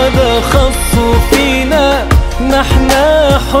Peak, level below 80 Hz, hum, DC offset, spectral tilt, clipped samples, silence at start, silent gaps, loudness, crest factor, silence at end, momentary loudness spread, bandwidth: 0 dBFS; -14 dBFS; none; under 0.1%; -5 dB/octave; 0.4%; 0 s; none; -10 LUFS; 10 dB; 0 s; 3 LU; 16.5 kHz